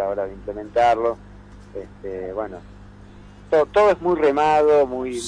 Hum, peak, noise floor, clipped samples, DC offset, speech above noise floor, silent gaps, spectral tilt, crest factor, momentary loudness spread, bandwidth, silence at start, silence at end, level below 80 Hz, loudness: 50 Hz at -45 dBFS; -8 dBFS; -43 dBFS; under 0.1%; under 0.1%; 23 dB; none; -5 dB/octave; 12 dB; 20 LU; 10.5 kHz; 0 s; 0 s; -46 dBFS; -19 LUFS